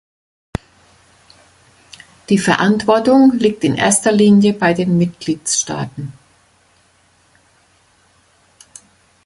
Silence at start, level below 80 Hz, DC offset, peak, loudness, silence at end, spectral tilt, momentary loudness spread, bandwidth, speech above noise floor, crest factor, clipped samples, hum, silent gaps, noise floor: 2.3 s; -50 dBFS; under 0.1%; 0 dBFS; -14 LUFS; 3.15 s; -4.5 dB/octave; 19 LU; 11.5 kHz; 41 dB; 18 dB; under 0.1%; none; none; -55 dBFS